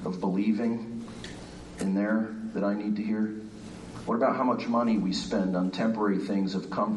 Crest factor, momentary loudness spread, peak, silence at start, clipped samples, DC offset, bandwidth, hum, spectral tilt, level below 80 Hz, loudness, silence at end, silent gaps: 16 dB; 15 LU; -12 dBFS; 0 s; under 0.1%; under 0.1%; 11.5 kHz; none; -6.5 dB/octave; -58 dBFS; -29 LUFS; 0 s; none